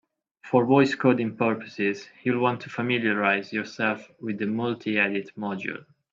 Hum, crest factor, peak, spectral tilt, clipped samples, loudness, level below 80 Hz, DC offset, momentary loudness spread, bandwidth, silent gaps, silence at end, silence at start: none; 20 dB; -6 dBFS; -6.5 dB/octave; under 0.1%; -25 LUFS; -70 dBFS; under 0.1%; 12 LU; 7.6 kHz; none; 0.35 s; 0.45 s